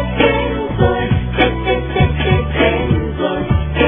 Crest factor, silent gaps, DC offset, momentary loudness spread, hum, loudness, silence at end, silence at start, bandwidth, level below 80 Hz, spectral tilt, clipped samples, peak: 14 dB; none; under 0.1%; 4 LU; none; -16 LUFS; 0 s; 0 s; 3.7 kHz; -24 dBFS; -10.5 dB/octave; under 0.1%; 0 dBFS